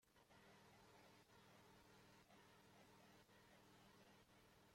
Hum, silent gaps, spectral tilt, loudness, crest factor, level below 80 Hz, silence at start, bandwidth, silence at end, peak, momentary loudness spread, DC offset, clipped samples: none; none; -4 dB/octave; -70 LUFS; 12 dB; -88 dBFS; 0 s; 16 kHz; 0 s; -58 dBFS; 1 LU; under 0.1%; under 0.1%